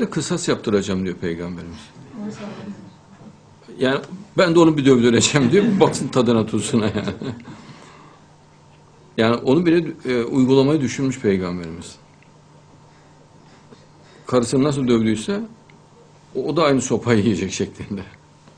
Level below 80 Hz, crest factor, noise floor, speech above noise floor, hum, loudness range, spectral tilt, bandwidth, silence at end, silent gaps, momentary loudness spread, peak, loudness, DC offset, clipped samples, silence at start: -52 dBFS; 20 dB; -49 dBFS; 31 dB; none; 11 LU; -5.5 dB/octave; 10.5 kHz; 0.5 s; none; 20 LU; 0 dBFS; -19 LUFS; under 0.1%; under 0.1%; 0 s